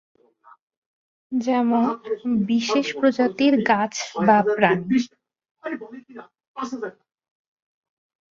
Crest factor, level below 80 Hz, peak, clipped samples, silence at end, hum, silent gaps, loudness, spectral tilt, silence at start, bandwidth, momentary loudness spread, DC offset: 20 dB; -66 dBFS; -2 dBFS; under 0.1%; 1.4 s; none; 5.51-5.55 s, 6.47-6.54 s; -21 LUFS; -5 dB/octave; 1.3 s; 7.6 kHz; 16 LU; under 0.1%